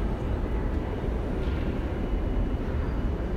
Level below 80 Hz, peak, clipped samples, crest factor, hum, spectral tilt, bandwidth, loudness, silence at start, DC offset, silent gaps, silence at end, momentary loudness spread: -30 dBFS; -16 dBFS; under 0.1%; 12 dB; none; -8.5 dB/octave; 7 kHz; -30 LUFS; 0 s; under 0.1%; none; 0 s; 1 LU